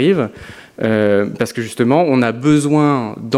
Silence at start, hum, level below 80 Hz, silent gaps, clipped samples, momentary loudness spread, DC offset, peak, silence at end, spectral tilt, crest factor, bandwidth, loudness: 0 s; none; -50 dBFS; none; under 0.1%; 9 LU; under 0.1%; 0 dBFS; 0 s; -6.5 dB/octave; 14 dB; 14 kHz; -15 LUFS